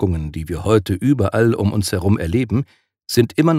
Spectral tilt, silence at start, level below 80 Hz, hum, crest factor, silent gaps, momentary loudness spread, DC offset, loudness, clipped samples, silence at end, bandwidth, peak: -6.5 dB/octave; 0 s; -38 dBFS; none; 16 dB; none; 8 LU; under 0.1%; -18 LUFS; under 0.1%; 0 s; 16 kHz; -2 dBFS